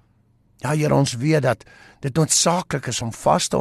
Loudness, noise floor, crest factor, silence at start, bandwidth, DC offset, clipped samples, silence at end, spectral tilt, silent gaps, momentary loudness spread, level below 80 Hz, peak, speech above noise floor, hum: -20 LUFS; -59 dBFS; 16 dB; 0.65 s; 13 kHz; under 0.1%; under 0.1%; 0 s; -4.5 dB/octave; none; 10 LU; -52 dBFS; -6 dBFS; 39 dB; none